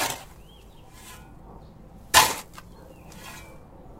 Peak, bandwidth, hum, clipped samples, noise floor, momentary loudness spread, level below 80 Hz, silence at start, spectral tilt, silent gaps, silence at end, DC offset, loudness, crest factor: -2 dBFS; 16 kHz; none; under 0.1%; -48 dBFS; 29 LU; -50 dBFS; 0 s; -0.5 dB/octave; none; 0.1 s; under 0.1%; -21 LUFS; 28 dB